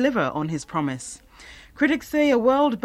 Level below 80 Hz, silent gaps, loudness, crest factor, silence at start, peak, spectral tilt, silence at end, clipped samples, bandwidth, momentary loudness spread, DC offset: -54 dBFS; none; -22 LUFS; 16 dB; 0 s; -6 dBFS; -5.5 dB/octave; 0.05 s; under 0.1%; 14.5 kHz; 18 LU; under 0.1%